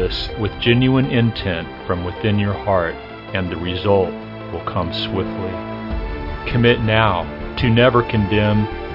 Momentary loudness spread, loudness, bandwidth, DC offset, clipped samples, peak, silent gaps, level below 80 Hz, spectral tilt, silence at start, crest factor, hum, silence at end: 12 LU; -19 LUFS; 5.8 kHz; under 0.1%; under 0.1%; 0 dBFS; none; -34 dBFS; -8.5 dB/octave; 0 s; 18 dB; none; 0 s